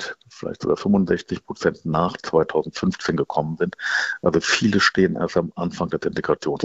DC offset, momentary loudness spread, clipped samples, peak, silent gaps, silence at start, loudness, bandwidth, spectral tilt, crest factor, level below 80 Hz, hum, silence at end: under 0.1%; 8 LU; under 0.1%; -2 dBFS; none; 0 s; -22 LUFS; 8.2 kHz; -5 dB/octave; 20 dB; -52 dBFS; none; 0 s